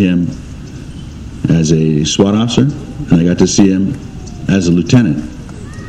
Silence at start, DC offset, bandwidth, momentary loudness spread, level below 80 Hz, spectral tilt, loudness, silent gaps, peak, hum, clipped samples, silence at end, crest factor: 0 s; under 0.1%; 9.6 kHz; 19 LU; -32 dBFS; -6 dB/octave; -12 LUFS; none; 0 dBFS; none; 0.3%; 0 s; 12 dB